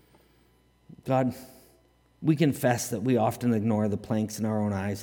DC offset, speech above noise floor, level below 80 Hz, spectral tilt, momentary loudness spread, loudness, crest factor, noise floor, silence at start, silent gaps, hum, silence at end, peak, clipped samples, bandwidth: under 0.1%; 37 dB; -64 dBFS; -6.5 dB/octave; 7 LU; -27 LUFS; 18 dB; -63 dBFS; 1.05 s; none; none; 0 s; -10 dBFS; under 0.1%; 18 kHz